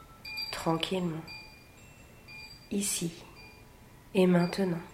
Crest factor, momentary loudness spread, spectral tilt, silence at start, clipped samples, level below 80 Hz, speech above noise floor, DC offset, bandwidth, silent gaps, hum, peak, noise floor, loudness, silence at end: 20 dB; 25 LU; -5 dB/octave; 0 s; under 0.1%; -60 dBFS; 25 dB; under 0.1%; 16 kHz; none; none; -12 dBFS; -54 dBFS; -31 LUFS; 0 s